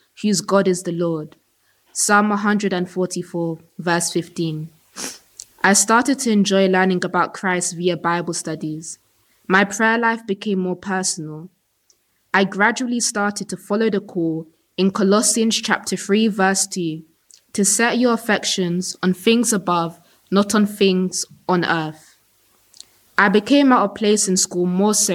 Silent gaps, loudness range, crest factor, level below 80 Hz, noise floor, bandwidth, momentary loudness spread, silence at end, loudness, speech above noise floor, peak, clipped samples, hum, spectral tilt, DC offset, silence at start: none; 3 LU; 18 dB; -66 dBFS; -62 dBFS; 16 kHz; 13 LU; 0 s; -18 LUFS; 44 dB; -2 dBFS; under 0.1%; none; -3.5 dB/octave; under 0.1%; 0.2 s